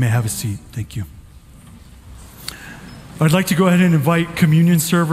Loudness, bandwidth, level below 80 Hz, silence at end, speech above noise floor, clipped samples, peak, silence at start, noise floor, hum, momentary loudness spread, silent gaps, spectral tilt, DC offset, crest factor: -16 LUFS; 16 kHz; -44 dBFS; 0 s; 26 dB; under 0.1%; -2 dBFS; 0 s; -42 dBFS; none; 21 LU; none; -6 dB/octave; under 0.1%; 16 dB